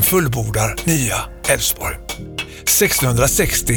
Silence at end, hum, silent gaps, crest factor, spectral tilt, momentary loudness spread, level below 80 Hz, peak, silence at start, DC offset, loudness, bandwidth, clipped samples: 0 s; none; none; 16 dB; -3.5 dB/octave; 12 LU; -32 dBFS; -2 dBFS; 0 s; under 0.1%; -16 LUFS; over 20 kHz; under 0.1%